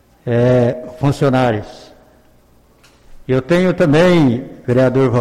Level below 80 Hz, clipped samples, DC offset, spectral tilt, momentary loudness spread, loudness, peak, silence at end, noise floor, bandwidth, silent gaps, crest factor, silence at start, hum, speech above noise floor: -42 dBFS; under 0.1%; under 0.1%; -7.5 dB/octave; 10 LU; -14 LUFS; -4 dBFS; 0 s; -50 dBFS; 12.5 kHz; none; 12 dB; 0.25 s; none; 37 dB